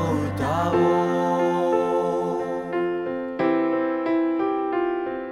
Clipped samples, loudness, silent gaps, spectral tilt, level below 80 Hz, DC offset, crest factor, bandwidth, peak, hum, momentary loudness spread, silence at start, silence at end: under 0.1%; -23 LUFS; none; -7.5 dB/octave; -54 dBFS; under 0.1%; 14 dB; 12 kHz; -10 dBFS; none; 6 LU; 0 s; 0 s